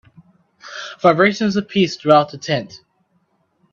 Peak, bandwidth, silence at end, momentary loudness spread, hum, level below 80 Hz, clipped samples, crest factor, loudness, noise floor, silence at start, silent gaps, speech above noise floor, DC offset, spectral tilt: 0 dBFS; 7.4 kHz; 0.95 s; 18 LU; none; -60 dBFS; under 0.1%; 20 dB; -16 LUFS; -64 dBFS; 0.65 s; none; 48 dB; under 0.1%; -5.5 dB/octave